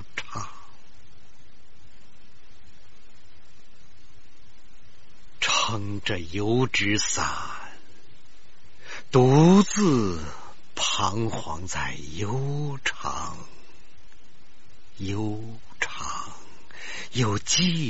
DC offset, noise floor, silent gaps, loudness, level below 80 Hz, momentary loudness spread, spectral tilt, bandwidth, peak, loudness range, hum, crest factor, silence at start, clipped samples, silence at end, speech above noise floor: 3%; -57 dBFS; none; -25 LUFS; -52 dBFS; 21 LU; -4.5 dB/octave; 8 kHz; -6 dBFS; 13 LU; none; 22 dB; 0 s; under 0.1%; 0 s; 33 dB